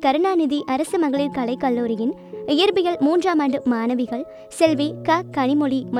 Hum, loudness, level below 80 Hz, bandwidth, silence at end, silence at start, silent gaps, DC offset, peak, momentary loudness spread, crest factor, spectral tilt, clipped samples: none; -21 LUFS; -60 dBFS; 13.5 kHz; 0 s; 0 s; none; under 0.1%; -2 dBFS; 6 LU; 18 dB; -5 dB/octave; under 0.1%